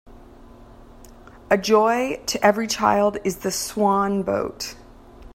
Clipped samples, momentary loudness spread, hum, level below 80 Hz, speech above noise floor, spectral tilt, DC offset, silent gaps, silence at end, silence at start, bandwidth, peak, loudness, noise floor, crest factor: under 0.1%; 8 LU; none; -48 dBFS; 24 dB; -4 dB/octave; under 0.1%; none; 0.05 s; 0.05 s; 16.5 kHz; -2 dBFS; -21 LUFS; -45 dBFS; 20 dB